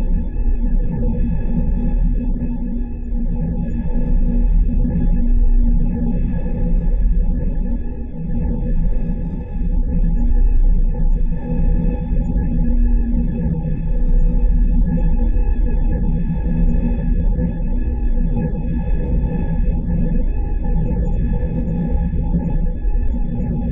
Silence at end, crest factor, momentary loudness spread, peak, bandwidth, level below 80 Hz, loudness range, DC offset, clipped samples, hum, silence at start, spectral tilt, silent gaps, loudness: 0 s; 10 dB; 4 LU; -6 dBFS; 2.8 kHz; -16 dBFS; 2 LU; under 0.1%; under 0.1%; none; 0 s; -12.5 dB/octave; none; -21 LUFS